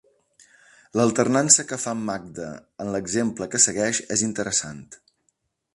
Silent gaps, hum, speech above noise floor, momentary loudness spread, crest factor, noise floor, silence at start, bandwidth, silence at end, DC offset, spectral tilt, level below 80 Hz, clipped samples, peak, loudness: none; none; 49 dB; 19 LU; 24 dB; -72 dBFS; 0.95 s; 11.5 kHz; 0.8 s; under 0.1%; -3 dB/octave; -60 dBFS; under 0.1%; -2 dBFS; -21 LUFS